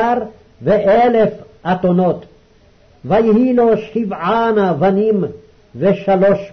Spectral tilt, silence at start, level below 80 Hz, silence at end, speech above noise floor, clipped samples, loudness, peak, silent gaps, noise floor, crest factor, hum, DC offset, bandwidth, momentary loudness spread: -9 dB/octave; 0 s; -46 dBFS; 0.05 s; 35 dB; under 0.1%; -15 LUFS; -4 dBFS; none; -49 dBFS; 10 dB; none; under 0.1%; 6.2 kHz; 11 LU